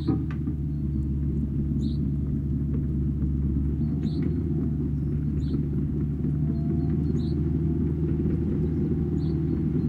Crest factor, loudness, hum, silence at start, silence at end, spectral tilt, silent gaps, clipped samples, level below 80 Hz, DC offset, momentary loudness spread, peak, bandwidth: 12 dB; -27 LUFS; none; 0 s; 0 s; -11 dB/octave; none; under 0.1%; -32 dBFS; under 0.1%; 2 LU; -12 dBFS; 4.7 kHz